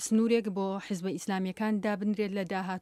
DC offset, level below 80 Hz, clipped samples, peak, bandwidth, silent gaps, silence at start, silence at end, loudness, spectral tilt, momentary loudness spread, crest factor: under 0.1%; -72 dBFS; under 0.1%; -14 dBFS; 14 kHz; none; 0 s; 0 s; -31 LUFS; -5.5 dB/octave; 7 LU; 16 dB